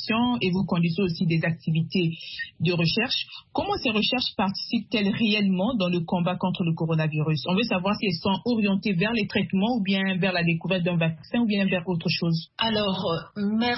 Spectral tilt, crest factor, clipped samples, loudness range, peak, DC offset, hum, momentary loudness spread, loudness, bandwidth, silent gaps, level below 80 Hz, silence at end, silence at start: -9 dB/octave; 14 dB; under 0.1%; 1 LU; -10 dBFS; under 0.1%; none; 5 LU; -25 LUFS; 6 kHz; none; -56 dBFS; 0 s; 0 s